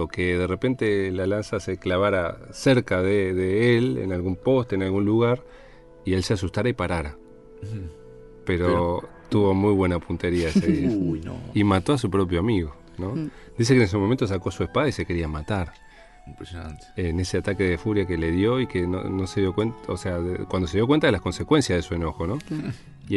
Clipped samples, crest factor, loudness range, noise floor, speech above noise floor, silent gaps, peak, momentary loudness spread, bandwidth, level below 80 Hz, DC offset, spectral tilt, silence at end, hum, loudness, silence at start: under 0.1%; 18 dB; 5 LU; -45 dBFS; 21 dB; none; -6 dBFS; 11 LU; 11.5 kHz; -42 dBFS; under 0.1%; -6.5 dB/octave; 0 s; none; -24 LUFS; 0 s